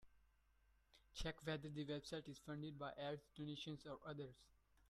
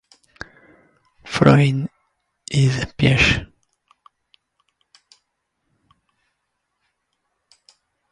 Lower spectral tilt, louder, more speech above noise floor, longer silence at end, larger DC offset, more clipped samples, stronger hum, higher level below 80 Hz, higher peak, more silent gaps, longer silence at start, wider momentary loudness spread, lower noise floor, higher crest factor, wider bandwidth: about the same, -5.5 dB/octave vs -6 dB/octave; second, -52 LUFS vs -18 LUFS; second, 27 dB vs 59 dB; second, 0.35 s vs 4.65 s; neither; neither; neither; second, -68 dBFS vs -42 dBFS; second, -34 dBFS vs 0 dBFS; neither; second, 0 s vs 1.25 s; second, 5 LU vs 25 LU; about the same, -78 dBFS vs -75 dBFS; second, 18 dB vs 24 dB; first, 13.5 kHz vs 11 kHz